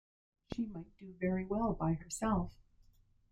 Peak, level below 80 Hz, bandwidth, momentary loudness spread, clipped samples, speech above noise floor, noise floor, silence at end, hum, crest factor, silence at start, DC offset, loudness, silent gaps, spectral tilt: -22 dBFS; -54 dBFS; 15.5 kHz; 12 LU; under 0.1%; 30 dB; -67 dBFS; 0.8 s; none; 18 dB; 0.5 s; under 0.1%; -37 LUFS; none; -6.5 dB/octave